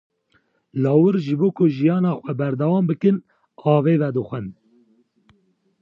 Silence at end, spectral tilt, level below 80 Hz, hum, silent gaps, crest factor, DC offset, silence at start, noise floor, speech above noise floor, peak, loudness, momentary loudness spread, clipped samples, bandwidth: 1.3 s; -10.5 dB/octave; -66 dBFS; none; none; 16 dB; under 0.1%; 0.75 s; -64 dBFS; 46 dB; -4 dBFS; -20 LUFS; 10 LU; under 0.1%; 5.8 kHz